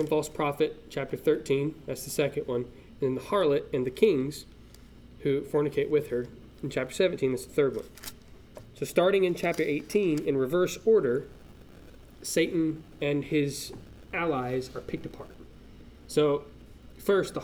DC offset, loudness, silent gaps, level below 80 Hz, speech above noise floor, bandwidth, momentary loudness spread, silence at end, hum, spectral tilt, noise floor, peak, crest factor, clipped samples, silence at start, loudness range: under 0.1%; -29 LUFS; none; -54 dBFS; 23 dB; 18.5 kHz; 14 LU; 0 s; none; -5.5 dB/octave; -50 dBFS; -8 dBFS; 20 dB; under 0.1%; 0 s; 5 LU